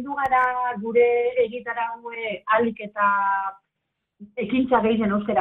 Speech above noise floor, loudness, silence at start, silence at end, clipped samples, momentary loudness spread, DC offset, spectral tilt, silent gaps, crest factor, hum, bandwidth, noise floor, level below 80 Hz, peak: 57 dB; -23 LUFS; 0 s; 0 s; under 0.1%; 10 LU; under 0.1%; -8 dB/octave; none; 16 dB; none; 4 kHz; -80 dBFS; -58 dBFS; -6 dBFS